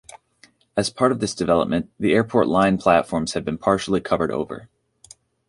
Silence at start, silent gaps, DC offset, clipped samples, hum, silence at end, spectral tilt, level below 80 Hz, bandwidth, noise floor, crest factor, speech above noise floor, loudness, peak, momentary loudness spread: 0.75 s; none; under 0.1%; under 0.1%; none; 0.85 s; -5.5 dB/octave; -50 dBFS; 11.5 kHz; -56 dBFS; 20 dB; 36 dB; -21 LUFS; -2 dBFS; 8 LU